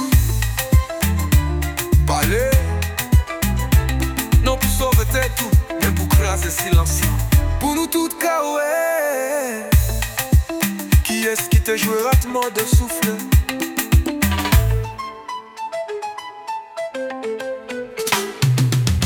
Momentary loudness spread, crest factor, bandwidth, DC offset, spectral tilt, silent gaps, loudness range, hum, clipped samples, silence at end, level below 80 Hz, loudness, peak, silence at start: 11 LU; 16 dB; 19 kHz; under 0.1%; -5 dB/octave; none; 5 LU; none; under 0.1%; 0 s; -22 dBFS; -19 LUFS; -2 dBFS; 0 s